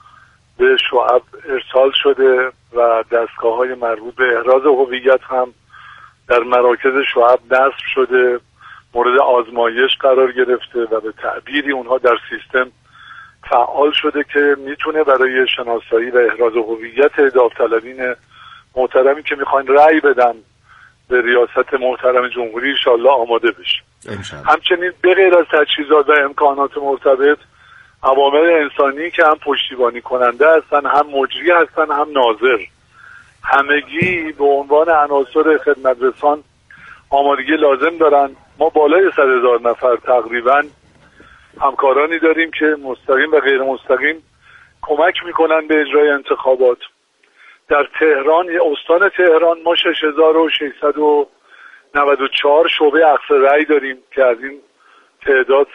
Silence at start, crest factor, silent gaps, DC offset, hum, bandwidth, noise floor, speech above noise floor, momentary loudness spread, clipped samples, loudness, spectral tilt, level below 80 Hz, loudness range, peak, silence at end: 0.6 s; 14 dB; none; under 0.1%; none; 7.6 kHz; -53 dBFS; 40 dB; 8 LU; under 0.1%; -14 LUFS; -5.5 dB/octave; -54 dBFS; 2 LU; 0 dBFS; 0.1 s